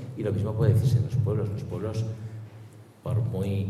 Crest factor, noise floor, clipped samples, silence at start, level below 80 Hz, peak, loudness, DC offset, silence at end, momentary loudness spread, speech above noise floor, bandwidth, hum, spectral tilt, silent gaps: 18 dB; -47 dBFS; under 0.1%; 0 s; -56 dBFS; -8 dBFS; -27 LUFS; under 0.1%; 0 s; 17 LU; 22 dB; 13 kHz; none; -8.5 dB/octave; none